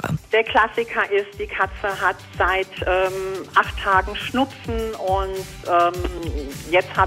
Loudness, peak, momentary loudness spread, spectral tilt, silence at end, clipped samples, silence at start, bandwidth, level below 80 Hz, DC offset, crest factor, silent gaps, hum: -21 LUFS; -2 dBFS; 9 LU; -5 dB/octave; 0 s; under 0.1%; 0 s; 16 kHz; -36 dBFS; under 0.1%; 20 dB; none; none